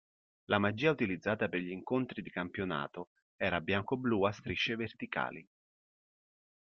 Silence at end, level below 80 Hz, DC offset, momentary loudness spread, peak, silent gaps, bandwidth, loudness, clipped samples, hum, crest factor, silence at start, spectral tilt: 1.15 s; -68 dBFS; under 0.1%; 9 LU; -12 dBFS; 3.07-3.16 s, 3.22-3.39 s; 6.8 kHz; -35 LUFS; under 0.1%; none; 24 dB; 0.5 s; -4 dB/octave